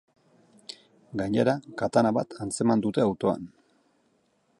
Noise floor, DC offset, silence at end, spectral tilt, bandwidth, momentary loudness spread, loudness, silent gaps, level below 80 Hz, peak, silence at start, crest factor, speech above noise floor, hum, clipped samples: -69 dBFS; under 0.1%; 1.15 s; -6 dB/octave; 11.5 kHz; 20 LU; -26 LUFS; none; -62 dBFS; -8 dBFS; 0.7 s; 20 dB; 43 dB; none; under 0.1%